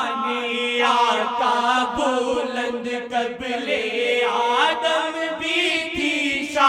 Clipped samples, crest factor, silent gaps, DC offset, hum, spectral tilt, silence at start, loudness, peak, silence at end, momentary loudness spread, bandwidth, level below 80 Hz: under 0.1%; 18 dB; none; under 0.1%; none; -2 dB/octave; 0 s; -21 LUFS; -2 dBFS; 0 s; 7 LU; 15 kHz; -56 dBFS